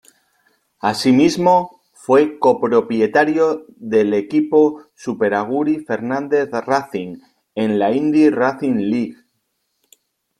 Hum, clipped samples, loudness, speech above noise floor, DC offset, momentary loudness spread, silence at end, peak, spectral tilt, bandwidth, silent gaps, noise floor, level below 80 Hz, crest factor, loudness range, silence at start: none; under 0.1%; -17 LUFS; 54 dB; under 0.1%; 14 LU; 1.25 s; -2 dBFS; -6 dB/octave; 13 kHz; none; -70 dBFS; -60 dBFS; 16 dB; 4 LU; 0.85 s